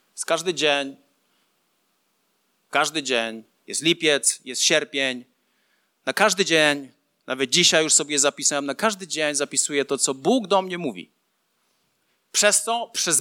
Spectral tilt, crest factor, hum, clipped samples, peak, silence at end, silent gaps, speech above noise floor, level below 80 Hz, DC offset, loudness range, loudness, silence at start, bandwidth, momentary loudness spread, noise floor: -1.5 dB/octave; 22 dB; none; under 0.1%; -2 dBFS; 0 s; none; 49 dB; -82 dBFS; under 0.1%; 6 LU; -21 LUFS; 0.15 s; 17.5 kHz; 12 LU; -71 dBFS